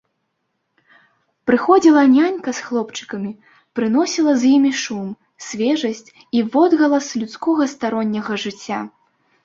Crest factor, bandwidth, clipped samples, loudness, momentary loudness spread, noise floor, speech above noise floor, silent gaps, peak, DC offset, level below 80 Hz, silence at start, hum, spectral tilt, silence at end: 18 dB; 7.8 kHz; under 0.1%; -18 LUFS; 16 LU; -72 dBFS; 55 dB; none; 0 dBFS; under 0.1%; -64 dBFS; 1.45 s; none; -4.5 dB/octave; 0.55 s